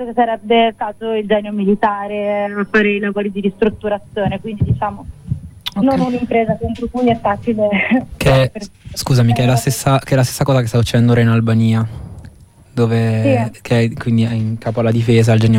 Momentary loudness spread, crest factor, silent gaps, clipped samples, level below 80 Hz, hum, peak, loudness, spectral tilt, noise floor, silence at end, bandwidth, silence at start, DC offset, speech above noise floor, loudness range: 9 LU; 14 dB; none; under 0.1%; -38 dBFS; none; -2 dBFS; -16 LUFS; -6.5 dB/octave; -41 dBFS; 0 s; 16 kHz; 0 s; under 0.1%; 27 dB; 4 LU